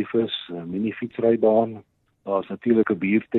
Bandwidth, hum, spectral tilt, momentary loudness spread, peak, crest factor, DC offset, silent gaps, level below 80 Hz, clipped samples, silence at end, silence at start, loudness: 4.2 kHz; none; -9.5 dB/octave; 11 LU; -6 dBFS; 16 dB; under 0.1%; none; -64 dBFS; under 0.1%; 0 s; 0 s; -23 LUFS